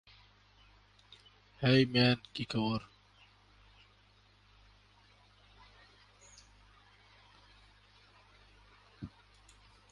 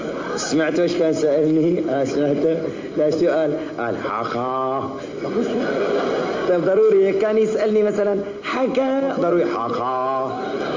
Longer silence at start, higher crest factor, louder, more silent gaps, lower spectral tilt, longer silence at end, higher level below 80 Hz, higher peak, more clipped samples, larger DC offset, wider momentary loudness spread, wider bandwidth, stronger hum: first, 1.6 s vs 0 s; first, 24 dB vs 12 dB; second, -31 LUFS vs -20 LUFS; neither; about the same, -6.5 dB/octave vs -6 dB/octave; first, 0.85 s vs 0 s; second, -64 dBFS vs -58 dBFS; second, -16 dBFS vs -8 dBFS; neither; neither; first, 31 LU vs 7 LU; first, 11 kHz vs 7.6 kHz; first, 50 Hz at -65 dBFS vs none